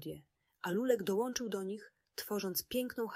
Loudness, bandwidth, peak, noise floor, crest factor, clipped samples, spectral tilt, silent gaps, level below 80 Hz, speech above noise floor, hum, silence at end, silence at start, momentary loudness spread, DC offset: -37 LUFS; 16 kHz; -18 dBFS; -59 dBFS; 20 dB; under 0.1%; -4 dB/octave; none; -72 dBFS; 23 dB; none; 0 s; 0 s; 15 LU; under 0.1%